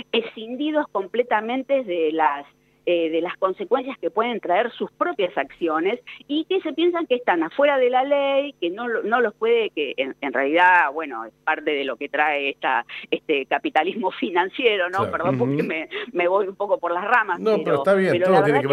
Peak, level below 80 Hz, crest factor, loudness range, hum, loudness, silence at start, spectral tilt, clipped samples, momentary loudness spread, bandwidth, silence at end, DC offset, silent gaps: -6 dBFS; -70 dBFS; 16 dB; 3 LU; none; -22 LUFS; 0.15 s; -6.5 dB/octave; under 0.1%; 8 LU; 11 kHz; 0 s; under 0.1%; none